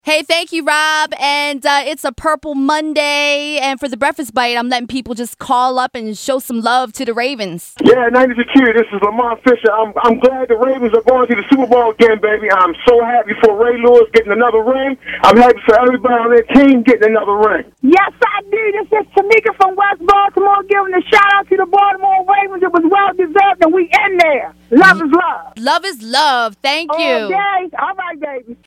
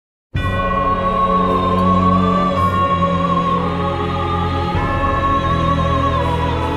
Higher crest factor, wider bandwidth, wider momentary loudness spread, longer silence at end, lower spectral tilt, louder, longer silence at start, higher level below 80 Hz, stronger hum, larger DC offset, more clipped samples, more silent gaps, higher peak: about the same, 12 dB vs 14 dB; first, 16 kHz vs 11 kHz; first, 9 LU vs 5 LU; about the same, 0.1 s vs 0 s; second, -4 dB/octave vs -7.5 dB/octave; first, -12 LUFS vs -16 LUFS; second, 0.05 s vs 0.35 s; second, -46 dBFS vs -28 dBFS; neither; neither; neither; neither; about the same, 0 dBFS vs -2 dBFS